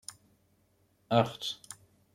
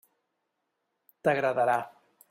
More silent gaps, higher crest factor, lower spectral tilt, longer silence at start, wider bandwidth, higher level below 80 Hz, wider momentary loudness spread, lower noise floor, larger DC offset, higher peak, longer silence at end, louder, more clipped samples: neither; first, 26 dB vs 20 dB; about the same, -5 dB/octave vs -6 dB/octave; second, 0.1 s vs 1.25 s; about the same, 16 kHz vs 16 kHz; about the same, -72 dBFS vs -76 dBFS; first, 21 LU vs 7 LU; second, -70 dBFS vs -81 dBFS; neither; about the same, -10 dBFS vs -12 dBFS; about the same, 0.4 s vs 0.45 s; second, -31 LUFS vs -28 LUFS; neither